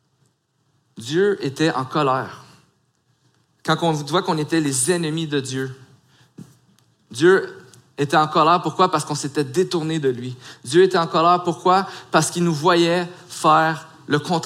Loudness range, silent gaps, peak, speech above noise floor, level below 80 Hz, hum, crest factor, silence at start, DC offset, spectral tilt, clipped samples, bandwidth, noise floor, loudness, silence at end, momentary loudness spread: 5 LU; none; -2 dBFS; 47 dB; -68 dBFS; none; 18 dB; 0.95 s; under 0.1%; -4.5 dB/octave; under 0.1%; 15.5 kHz; -66 dBFS; -19 LUFS; 0 s; 14 LU